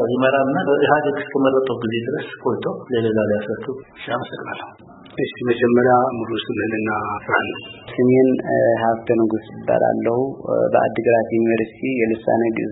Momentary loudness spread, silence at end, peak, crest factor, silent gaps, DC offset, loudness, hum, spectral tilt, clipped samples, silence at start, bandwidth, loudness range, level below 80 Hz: 11 LU; 0 s; 0 dBFS; 20 dB; none; under 0.1%; -19 LUFS; none; -11.5 dB/octave; under 0.1%; 0 s; 4 kHz; 5 LU; -58 dBFS